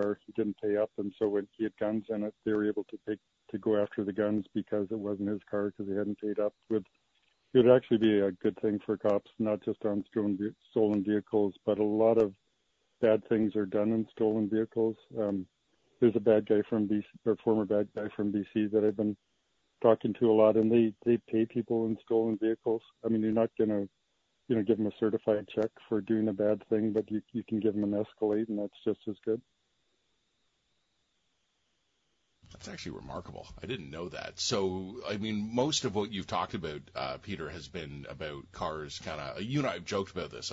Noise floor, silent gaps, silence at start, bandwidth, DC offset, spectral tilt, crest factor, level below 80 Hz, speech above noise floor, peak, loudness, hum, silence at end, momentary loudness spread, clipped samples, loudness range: -77 dBFS; none; 0 s; 7.8 kHz; under 0.1%; -6 dB/octave; 22 dB; -64 dBFS; 47 dB; -8 dBFS; -31 LUFS; none; 0 s; 13 LU; under 0.1%; 9 LU